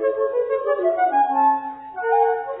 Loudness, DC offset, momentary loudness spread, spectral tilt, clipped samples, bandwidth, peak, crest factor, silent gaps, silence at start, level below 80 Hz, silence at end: -20 LUFS; under 0.1%; 7 LU; -8 dB/octave; under 0.1%; 4 kHz; -8 dBFS; 12 dB; none; 0 s; -68 dBFS; 0 s